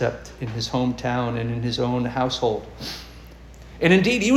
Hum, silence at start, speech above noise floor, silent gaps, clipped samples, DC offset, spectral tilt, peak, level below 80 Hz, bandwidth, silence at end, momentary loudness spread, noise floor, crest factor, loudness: none; 0 s; 20 dB; none; under 0.1%; under 0.1%; -5.5 dB/octave; -4 dBFS; -44 dBFS; 15.5 kHz; 0 s; 16 LU; -42 dBFS; 20 dB; -23 LUFS